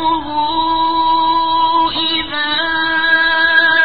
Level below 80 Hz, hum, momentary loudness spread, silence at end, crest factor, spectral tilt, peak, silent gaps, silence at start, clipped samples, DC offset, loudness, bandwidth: -44 dBFS; none; 6 LU; 0 s; 14 dB; -8 dB/octave; 0 dBFS; none; 0 s; under 0.1%; 2%; -13 LUFS; 4.9 kHz